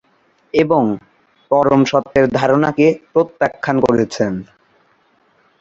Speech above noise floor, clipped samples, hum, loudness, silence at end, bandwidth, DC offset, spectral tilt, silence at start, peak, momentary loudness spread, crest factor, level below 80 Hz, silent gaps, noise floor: 43 dB; under 0.1%; none; -15 LUFS; 1.2 s; 7.8 kHz; under 0.1%; -6.5 dB/octave; 0.55 s; -2 dBFS; 8 LU; 16 dB; -50 dBFS; none; -57 dBFS